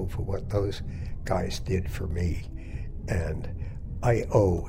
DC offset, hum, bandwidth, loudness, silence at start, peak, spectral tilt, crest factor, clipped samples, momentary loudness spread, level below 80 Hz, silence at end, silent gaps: under 0.1%; none; 16 kHz; -30 LUFS; 0 s; -10 dBFS; -7 dB/octave; 18 dB; under 0.1%; 14 LU; -36 dBFS; 0 s; none